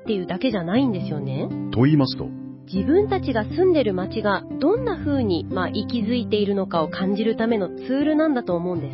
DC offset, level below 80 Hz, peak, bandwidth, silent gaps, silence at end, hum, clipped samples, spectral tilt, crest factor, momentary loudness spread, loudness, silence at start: under 0.1%; -46 dBFS; -6 dBFS; 5.8 kHz; none; 0 s; none; under 0.1%; -11.5 dB/octave; 16 dB; 8 LU; -22 LUFS; 0 s